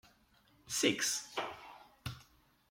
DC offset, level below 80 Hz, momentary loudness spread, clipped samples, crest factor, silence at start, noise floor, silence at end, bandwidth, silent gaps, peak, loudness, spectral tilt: under 0.1%; -70 dBFS; 22 LU; under 0.1%; 24 dB; 0.65 s; -69 dBFS; 0.5 s; 16.5 kHz; none; -16 dBFS; -36 LUFS; -2 dB/octave